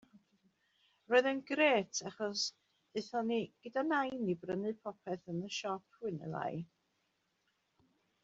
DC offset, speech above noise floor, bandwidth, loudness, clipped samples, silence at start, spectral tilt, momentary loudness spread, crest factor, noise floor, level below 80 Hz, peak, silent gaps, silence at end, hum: under 0.1%; 45 dB; 8 kHz; -36 LUFS; under 0.1%; 0.15 s; -3 dB/octave; 13 LU; 22 dB; -81 dBFS; -80 dBFS; -16 dBFS; none; 1.6 s; none